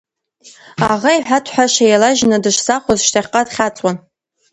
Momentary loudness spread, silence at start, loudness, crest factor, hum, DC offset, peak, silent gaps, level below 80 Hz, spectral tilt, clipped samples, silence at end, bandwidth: 9 LU; 0.45 s; -14 LUFS; 16 dB; none; under 0.1%; 0 dBFS; none; -50 dBFS; -3 dB/octave; under 0.1%; 0.55 s; 11 kHz